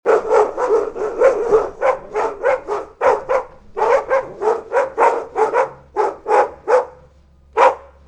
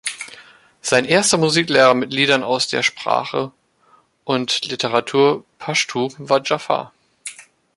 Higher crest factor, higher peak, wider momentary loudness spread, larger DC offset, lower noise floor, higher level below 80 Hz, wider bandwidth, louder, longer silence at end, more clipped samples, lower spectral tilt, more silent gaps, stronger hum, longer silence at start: about the same, 18 dB vs 18 dB; about the same, 0 dBFS vs 0 dBFS; second, 7 LU vs 19 LU; neither; second, -49 dBFS vs -56 dBFS; first, -48 dBFS vs -62 dBFS; second, 9.8 kHz vs 11.5 kHz; about the same, -18 LUFS vs -18 LUFS; about the same, 0.25 s vs 0.35 s; neither; first, -4.5 dB/octave vs -3 dB/octave; neither; neither; about the same, 0.05 s vs 0.05 s